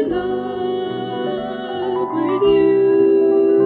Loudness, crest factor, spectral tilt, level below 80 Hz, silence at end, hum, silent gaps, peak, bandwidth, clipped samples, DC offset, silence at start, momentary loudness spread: -18 LUFS; 12 dB; -9 dB/octave; -50 dBFS; 0 s; none; none; -4 dBFS; 4.2 kHz; under 0.1%; under 0.1%; 0 s; 10 LU